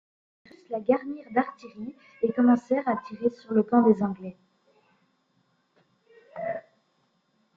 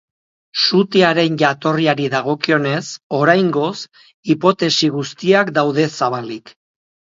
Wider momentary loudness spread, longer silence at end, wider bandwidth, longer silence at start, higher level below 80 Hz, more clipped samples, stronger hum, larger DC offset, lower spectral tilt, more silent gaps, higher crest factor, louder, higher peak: first, 19 LU vs 12 LU; first, 0.95 s vs 0.7 s; second, 6.8 kHz vs 7.8 kHz; first, 0.7 s vs 0.55 s; second, -72 dBFS vs -64 dBFS; neither; neither; neither; first, -9 dB/octave vs -5 dB/octave; second, none vs 3.03-3.10 s, 4.14-4.23 s; about the same, 20 dB vs 16 dB; second, -26 LUFS vs -16 LUFS; second, -8 dBFS vs 0 dBFS